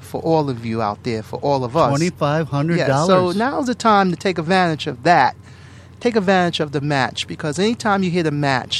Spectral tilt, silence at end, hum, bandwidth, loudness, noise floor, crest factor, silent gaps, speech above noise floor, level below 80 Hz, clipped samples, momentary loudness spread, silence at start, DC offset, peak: -5.5 dB/octave; 0 s; none; 13 kHz; -18 LUFS; -41 dBFS; 18 dB; none; 23 dB; -54 dBFS; under 0.1%; 7 LU; 0 s; under 0.1%; 0 dBFS